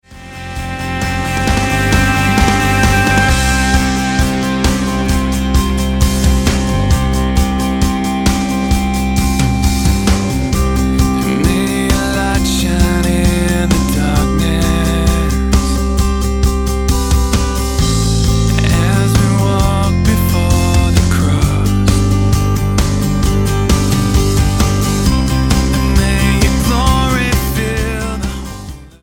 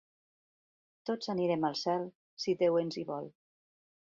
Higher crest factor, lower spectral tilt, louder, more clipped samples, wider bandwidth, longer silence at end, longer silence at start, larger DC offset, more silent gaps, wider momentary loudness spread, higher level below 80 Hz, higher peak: second, 12 dB vs 18 dB; about the same, -5 dB/octave vs -6 dB/octave; first, -13 LUFS vs -33 LUFS; neither; first, 17.5 kHz vs 7.6 kHz; second, 0.15 s vs 0.85 s; second, 0.1 s vs 1.05 s; neither; second, none vs 2.15-2.37 s; second, 4 LU vs 14 LU; first, -18 dBFS vs -78 dBFS; first, 0 dBFS vs -18 dBFS